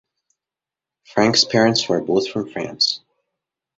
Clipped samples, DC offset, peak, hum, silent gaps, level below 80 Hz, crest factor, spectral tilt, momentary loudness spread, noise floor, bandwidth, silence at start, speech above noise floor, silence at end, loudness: under 0.1%; under 0.1%; -2 dBFS; none; none; -60 dBFS; 20 dB; -3.5 dB/octave; 11 LU; -88 dBFS; 8 kHz; 1.15 s; 70 dB; 0.8 s; -18 LUFS